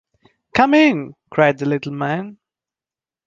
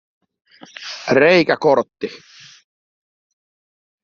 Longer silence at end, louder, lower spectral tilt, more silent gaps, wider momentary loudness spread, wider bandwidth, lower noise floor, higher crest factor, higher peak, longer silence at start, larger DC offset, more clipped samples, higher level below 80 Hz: second, 0.95 s vs 1.9 s; about the same, -17 LUFS vs -15 LUFS; about the same, -6.5 dB/octave vs -5.5 dB/octave; neither; second, 13 LU vs 18 LU; about the same, 7.4 kHz vs 7.2 kHz; about the same, under -90 dBFS vs under -90 dBFS; about the same, 18 dB vs 18 dB; about the same, -2 dBFS vs -2 dBFS; second, 0.55 s vs 0.8 s; neither; neither; first, -56 dBFS vs -62 dBFS